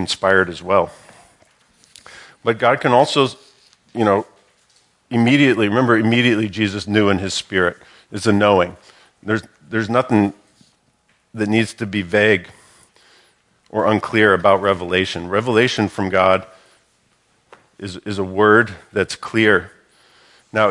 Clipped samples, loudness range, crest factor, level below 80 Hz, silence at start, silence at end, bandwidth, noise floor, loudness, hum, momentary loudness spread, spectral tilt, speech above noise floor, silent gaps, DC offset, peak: under 0.1%; 4 LU; 18 dB; -60 dBFS; 0 s; 0 s; 11.5 kHz; -61 dBFS; -17 LUFS; none; 11 LU; -5.5 dB/octave; 45 dB; none; under 0.1%; 0 dBFS